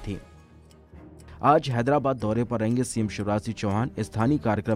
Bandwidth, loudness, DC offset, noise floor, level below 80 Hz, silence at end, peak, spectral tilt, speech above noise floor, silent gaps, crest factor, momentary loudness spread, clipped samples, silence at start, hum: 14 kHz; -25 LUFS; under 0.1%; -52 dBFS; -50 dBFS; 0 s; -6 dBFS; -6.5 dB/octave; 27 dB; none; 20 dB; 7 LU; under 0.1%; 0 s; none